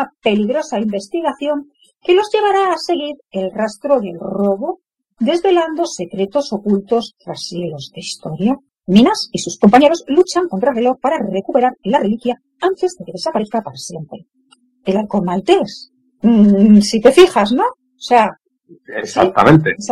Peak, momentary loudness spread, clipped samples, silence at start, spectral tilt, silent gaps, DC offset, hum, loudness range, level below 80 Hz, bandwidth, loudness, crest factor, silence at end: 0 dBFS; 16 LU; 0.1%; 0 s; -5.5 dB/octave; none; under 0.1%; none; 7 LU; -52 dBFS; 12 kHz; -15 LUFS; 16 dB; 0 s